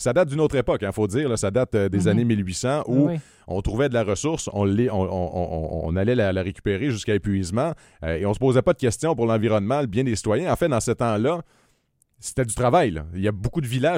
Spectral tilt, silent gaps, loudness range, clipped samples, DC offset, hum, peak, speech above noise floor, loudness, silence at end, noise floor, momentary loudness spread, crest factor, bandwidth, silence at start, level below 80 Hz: -6 dB/octave; none; 2 LU; under 0.1%; under 0.1%; none; -6 dBFS; 44 dB; -23 LUFS; 0 s; -66 dBFS; 7 LU; 18 dB; 16 kHz; 0 s; -42 dBFS